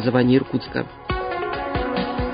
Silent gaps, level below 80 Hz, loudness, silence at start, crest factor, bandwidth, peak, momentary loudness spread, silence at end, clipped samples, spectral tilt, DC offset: none; -36 dBFS; -23 LUFS; 0 s; 18 dB; 5.2 kHz; -4 dBFS; 10 LU; 0 s; under 0.1%; -11.5 dB/octave; under 0.1%